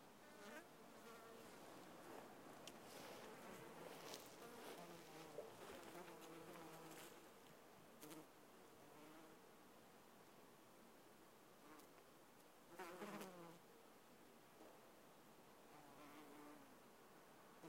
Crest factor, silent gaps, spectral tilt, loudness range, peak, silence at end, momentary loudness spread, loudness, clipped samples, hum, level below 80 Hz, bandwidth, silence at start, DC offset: 26 dB; none; -3.5 dB/octave; 8 LU; -34 dBFS; 0 s; 10 LU; -61 LUFS; under 0.1%; none; -90 dBFS; 16 kHz; 0 s; under 0.1%